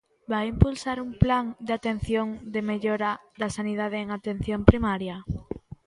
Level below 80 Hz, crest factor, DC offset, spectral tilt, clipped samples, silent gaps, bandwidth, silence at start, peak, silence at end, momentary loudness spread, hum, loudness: -36 dBFS; 26 dB; under 0.1%; -7 dB/octave; under 0.1%; none; 11.5 kHz; 0.3 s; 0 dBFS; 0.3 s; 11 LU; none; -27 LUFS